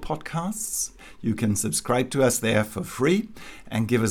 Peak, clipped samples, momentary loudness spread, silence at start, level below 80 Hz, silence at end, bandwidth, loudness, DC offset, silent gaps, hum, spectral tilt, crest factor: -8 dBFS; under 0.1%; 10 LU; 0 s; -48 dBFS; 0 s; 18 kHz; -25 LUFS; under 0.1%; none; none; -4.5 dB/octave; 18 dB